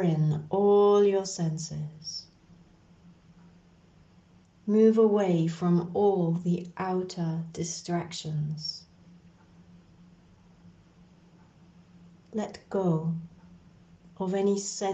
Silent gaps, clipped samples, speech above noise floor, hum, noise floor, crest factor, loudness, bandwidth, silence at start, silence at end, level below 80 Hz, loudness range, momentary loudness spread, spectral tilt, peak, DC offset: none; under 0.1%; 31 dB; none; -58 dBFS; 18 dB; -27 LUFS; 8.6 kHz; 0 s; 0 s; -68 dBFS; 14 LU; 15 LU; -6.5 dB/octave; -10 dBFS; under 0.1%